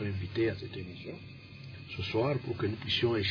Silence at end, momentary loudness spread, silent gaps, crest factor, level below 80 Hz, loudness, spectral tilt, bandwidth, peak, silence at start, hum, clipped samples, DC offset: 0 s; 17 LU; none; 16 dB; -60 dBFS; -33 LUFS; -7 dB/octave; 5.4 kHz; -18 dBFS; 0 s; none; under 0.1%; under 0.1%